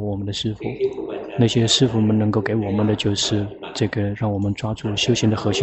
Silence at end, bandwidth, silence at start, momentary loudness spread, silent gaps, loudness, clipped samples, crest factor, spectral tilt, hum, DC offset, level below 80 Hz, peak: 0 s; 8.4 kHz; 0 s; 9 LU; none; -21 LUFS; under 0.1%; 16 dB; -5 dB/octave; none; under 0.1%; -48 dBFS; -4 dBFS